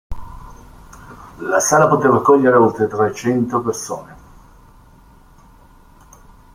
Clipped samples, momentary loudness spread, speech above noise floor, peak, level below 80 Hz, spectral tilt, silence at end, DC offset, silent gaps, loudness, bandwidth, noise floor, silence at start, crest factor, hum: under 0.1%; 18 LU; 31 dB; 0 dBFS; -42 dBFS; -5.5 dB/octave; 2.4 s; under 0.1%; none; -15 LUFS; 16 kHz; -46 dBFS; 0.1 s; 18 dB; none